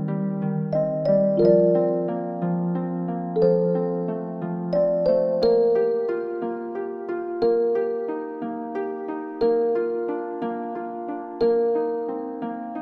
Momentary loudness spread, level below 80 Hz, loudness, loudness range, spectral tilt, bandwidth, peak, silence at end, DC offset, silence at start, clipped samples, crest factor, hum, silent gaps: 11 LU; -58 dBFS; -24 LUFS; 5 LU; -10.5 dB/octave; 5.6 kHz; -6 dBFS; 0 s; under 0.1%; 0 s; under 0.1%; 18 dB; none; none